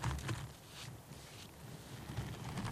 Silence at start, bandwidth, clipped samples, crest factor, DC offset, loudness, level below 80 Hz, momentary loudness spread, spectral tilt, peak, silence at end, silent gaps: 0 s; 15.5 kHz; under 0.1%; 20 dB; under 0.1%; -47 LUFS; -54 dBFS; 10 LU; -5 dB/octave; -26 dBFS; 0 s; none